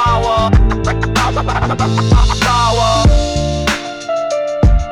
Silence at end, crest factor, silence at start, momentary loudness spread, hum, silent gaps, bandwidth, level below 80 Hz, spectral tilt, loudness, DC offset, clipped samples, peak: 0 s; 10 dB; 0 s; 6 LU; none; none; 12.5 kHz; -16 dBFS; -5.5 dB/octave; -14 LUFS; under 0.1%; under 0.1%; -2 dBFS